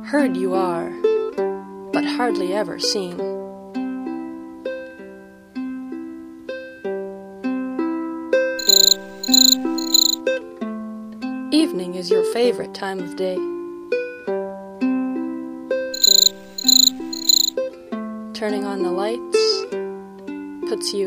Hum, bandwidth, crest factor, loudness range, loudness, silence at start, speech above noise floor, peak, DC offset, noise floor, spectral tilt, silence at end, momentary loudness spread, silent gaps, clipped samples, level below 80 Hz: none; 15.5 kHz; 20 dB; 15 LU; -19 LUFS; 0 s; 20 dB; 0 dBFS; under 0.1%; -41 dBFS; -1.5 dB/octave; 0 s; 19 LU; none; under 0.1%; -64 dBFS